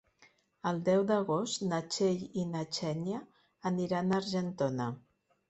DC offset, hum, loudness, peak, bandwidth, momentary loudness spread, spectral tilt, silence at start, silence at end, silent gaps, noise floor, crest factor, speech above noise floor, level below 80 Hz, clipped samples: under 0.1%; none; -33 LUFS; -16 dBFS; 8.2 kHz; 9 LU; -5.5 dB/octave; 0.2 s; 0.5 s; none; -66 dBFS; 16 dB; 34 dB; -72 dBFS; under 0.1%